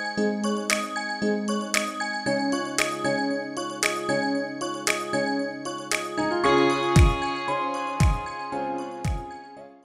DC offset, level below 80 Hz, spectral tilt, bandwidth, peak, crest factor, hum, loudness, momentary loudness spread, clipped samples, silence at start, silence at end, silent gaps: under 0.1%; -34 dBFS; -4.5 dB/octave; 16 kHz; -6 dBFS; 20 dB; none; -25 LUFS; 11 LU; under 0.1%; 0 s; 0.1 s; none